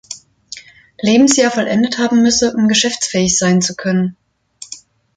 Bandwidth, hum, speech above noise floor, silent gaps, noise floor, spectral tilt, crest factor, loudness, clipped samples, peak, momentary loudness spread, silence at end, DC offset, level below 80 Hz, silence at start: 9.6 kHz; none; 27 dB; none; -40 dBFS; -3.5 dB/octave; 16 dB; -13 LUFS; under 0.1%; 0 dBFS; 21 LU; 0.4 s; under 0.1%; -50 dBFS; 0.1 s